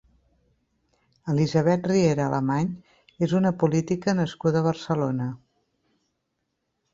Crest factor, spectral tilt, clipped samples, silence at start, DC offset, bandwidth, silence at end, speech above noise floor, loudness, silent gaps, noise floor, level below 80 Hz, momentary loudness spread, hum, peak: 18 dB; -7 dB/octave; under 0.1%; 1.25 s; under 0.1%; 7.6 kHz; 1.55 s; 55 dB; -24 LUFS; none; -78 dBFS; -60 dBFS; 9 LU; none; -6 dBFS